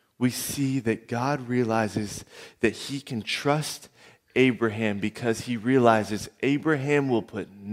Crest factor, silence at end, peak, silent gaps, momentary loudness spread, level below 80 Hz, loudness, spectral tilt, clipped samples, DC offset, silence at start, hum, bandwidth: 22 dB; 0 s; -4 dBFS; none; 12 LU; -62 dBFS; -26 LUFS; -5.5 dB/octave; under 0.1%; under 0.1%; 0.2 s; none; 16 kHz